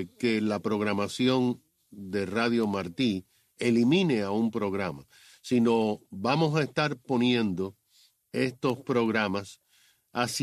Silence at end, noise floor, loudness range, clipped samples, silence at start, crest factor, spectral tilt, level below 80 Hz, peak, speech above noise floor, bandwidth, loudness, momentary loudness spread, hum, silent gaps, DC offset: 0 s; -65 dBFS; 2 LU; under 0.1%; 0 s; 18 dB; -5.5 dB/octave; -68 dBFS; -10 dBFS; 38 dB; 14 kHz; -28 LUFS; 11 LU; none; none; under 0.1%